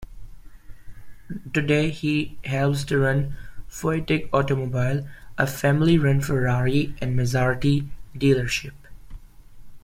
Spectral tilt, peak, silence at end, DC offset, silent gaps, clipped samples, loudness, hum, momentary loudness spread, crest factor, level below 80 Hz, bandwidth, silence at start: -6.5 dB/octave; -6 dBFS; 0.05 s; under 0.1%; none; under 0.1%; -23 LUFS; none; 11 LU; 18 dB; -42 dBFS; 16 kHz; 0 s